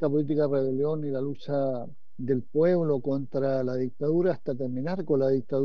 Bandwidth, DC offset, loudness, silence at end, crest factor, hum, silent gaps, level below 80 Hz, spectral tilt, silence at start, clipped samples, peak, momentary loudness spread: 6.2 kHz; 2%; -27 LUFS; 0 s; 14 dB; none; none; -72 dBFS; -10 dB/octave; 0 s; under 0.1%; -12 dBFS; 7 LU